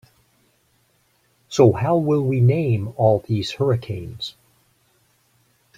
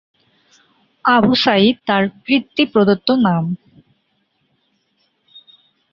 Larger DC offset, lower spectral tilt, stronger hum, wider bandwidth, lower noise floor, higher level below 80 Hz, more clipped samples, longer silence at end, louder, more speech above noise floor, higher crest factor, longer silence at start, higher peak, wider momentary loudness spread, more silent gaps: neither; about the same, -7.5 dB/octave vs -7 dB/octave; neither; first, 9.2 kHz vs 7 kHz; about the same, -63 dBFS vs -65 dBFS; about the same, -54 dBFS vs -56 dBFS; neither; second, 1.5 s vs 2.35 s; second, -20 LUFS vs -15 LUFS; second, 44 dB vs 51 dB; about the same, 18 dB vs 16 dB; first, 1.5 s vs 1.05 s; about the same, -2 dBFS vs -2 dBFS; first, 15 LU vs 8 LU; neither